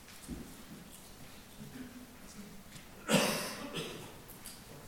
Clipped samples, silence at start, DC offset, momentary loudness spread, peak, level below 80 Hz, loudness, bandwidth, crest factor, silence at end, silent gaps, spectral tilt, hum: under 0.1%; 0 s; under 0.1%; 21 LU; -14 dBFS; -60 dBFS; -37 LUFS; 17.5 kHz; 26 dB; 0 s; none; -3.5 dB/octave; none